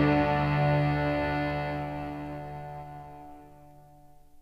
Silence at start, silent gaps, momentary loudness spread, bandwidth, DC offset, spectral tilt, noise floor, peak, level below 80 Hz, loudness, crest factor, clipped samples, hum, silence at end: 0 s; none; 20 LU; 5.8 kHz; under 0.1%; -8.5 dB/octave; -53 dBFS; -12 dBFS; -46 dBFS; -29 LUFS; 18 dB; under 0.1%; none; 0 s